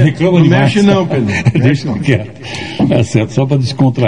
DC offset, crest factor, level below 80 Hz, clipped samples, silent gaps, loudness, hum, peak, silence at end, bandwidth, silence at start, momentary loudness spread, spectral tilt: 0.9%; 10 dB; -42 dBFS; 0.4%; none; -12 LUFS; none; 0 dBFS; 0 s; 10 kHz; 0 s; 7 LU; -7 dB/octave